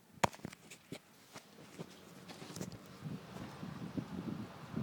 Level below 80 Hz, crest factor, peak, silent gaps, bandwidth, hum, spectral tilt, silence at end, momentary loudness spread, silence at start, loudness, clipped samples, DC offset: -70 dBFS; 32 dB; -12 dBFS; none; over 20 kHz; none; -5 dB/octave; 0 s; 16 LU; 0 s; -46 LUFS; under 0.1%; under 0.1%